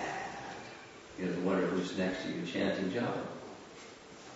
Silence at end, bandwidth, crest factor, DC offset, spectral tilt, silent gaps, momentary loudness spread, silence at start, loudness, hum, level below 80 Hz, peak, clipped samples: 0 s; 7.6 kHz; 18 dB; under 0.1%; -4.5 dB/octave; none; 18 LU; 0 s; -36 LUFS; none; -68 dBFS; -18 dBFS; under 0.1%